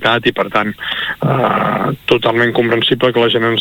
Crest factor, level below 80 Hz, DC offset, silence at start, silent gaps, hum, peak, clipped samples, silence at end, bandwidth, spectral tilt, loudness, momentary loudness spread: 14 dB; -48 dBFS; under 0.1%; 0 s; none; none; 0 dBFS; under 0.1%; 0 s; 18.5 kHz; -6.5 dB/octave; -14 LUFS; 5 LU